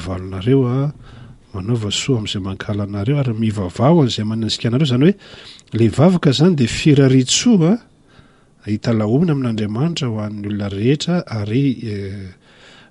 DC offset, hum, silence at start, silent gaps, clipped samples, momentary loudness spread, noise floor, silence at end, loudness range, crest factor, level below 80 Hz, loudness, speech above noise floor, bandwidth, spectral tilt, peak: under 0.1%; none; 0 s; none; under 0.1%; 13 LU; -49 dBFS; 0.6 s; 6 LU; 16 dB; -46 dBFS; -17 LUFS; 32 dB; 11.5 kHz; -6 dB/octave; -2 dBFS